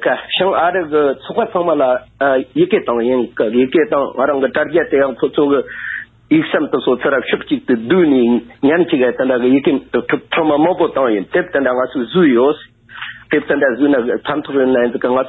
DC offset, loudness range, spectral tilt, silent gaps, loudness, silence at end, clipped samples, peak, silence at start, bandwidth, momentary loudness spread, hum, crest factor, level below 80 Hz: under 0.1%; 2 LU; -9.5 dB/octave; none; -15 LUFS; 0 s; under 0.1%; -2 dBFS; 0 s; 4.1 kHz; 5 LU; none; 12 dB; -52 dBFS